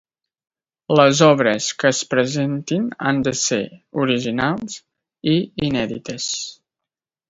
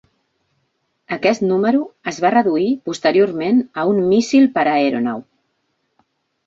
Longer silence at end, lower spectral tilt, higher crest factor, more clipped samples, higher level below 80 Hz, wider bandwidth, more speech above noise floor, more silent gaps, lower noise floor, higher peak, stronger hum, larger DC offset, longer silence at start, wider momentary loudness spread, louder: second, 0.75 s vs 1.25 s; about the same, -4.5 dB/octave vs -5.5 dB/octave; about the same, 20 dB vs 16 dB; neither; first, -54 dBFS vs -62 dBFS; about the same, 8 kHz vs 7.8 kHz; first, 68 dB vs 53 dB; neither; first, -86 dBFS vs -69 dBFS; about the same, 0 dBFS vs -2 dBFS; neither; neither; second, 0.9 s vs 1.1 s; first, 13 LU vs 7 LU; about the same, -19 LUFS vs -17 LUFS